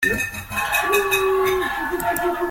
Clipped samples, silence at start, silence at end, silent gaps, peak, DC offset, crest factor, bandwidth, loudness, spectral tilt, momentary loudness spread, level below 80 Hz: under 0.1%; 0 s; 0 s; none; -6 dBFS; under 0.1%; 16 dB; 17 kHz; -20 LUFS; -3 dB/octave; 6 LU; -44 dBFS